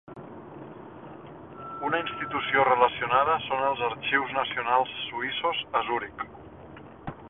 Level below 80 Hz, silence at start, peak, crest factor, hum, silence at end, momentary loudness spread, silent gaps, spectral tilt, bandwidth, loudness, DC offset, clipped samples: -60 dBFS; 0.1 s; -6 dBFS; 22 dB; none; 0 s; 22 LU; none; -8 dB/octave; 4 kHz; -26 LUFS; under 0.1%; under 0.1%